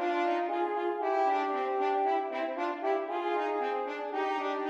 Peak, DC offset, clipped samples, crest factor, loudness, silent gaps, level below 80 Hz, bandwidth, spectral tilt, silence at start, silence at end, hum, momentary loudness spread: -18 dBFS; under 0.1%; under 0.1%; 12 dB; -31 LUFS; none; -88 dBFS; 8 kHz; -3 dB/octave; 0 s; 0 s; none; 5 LU